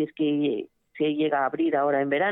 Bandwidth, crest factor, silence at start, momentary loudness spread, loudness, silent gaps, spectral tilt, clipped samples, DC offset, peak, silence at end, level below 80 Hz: 4 kHz; 14 dB; 0 s; 6 LU; -25 LUFS; none; -9 dB/octave; under 0.1%; under 0.1%; -12 dBFS; 0 s; -80 dBFS